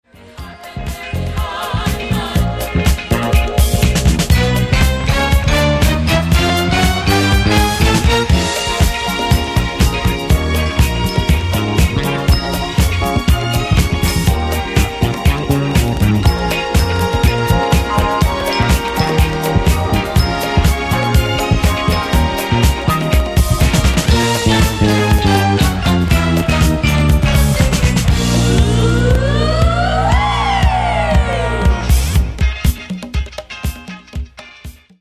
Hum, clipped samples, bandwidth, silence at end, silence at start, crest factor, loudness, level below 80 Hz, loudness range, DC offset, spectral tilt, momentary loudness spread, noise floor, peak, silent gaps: none; under 0.1%; 16 kHz; 0.3 s; 0.35 s; 14 dB; -14 LUFS; -18 dBFS; 2 LU; under 0.1%; -5 dB/octave; 6 LU; -35 dBFS; 0 dBFS; none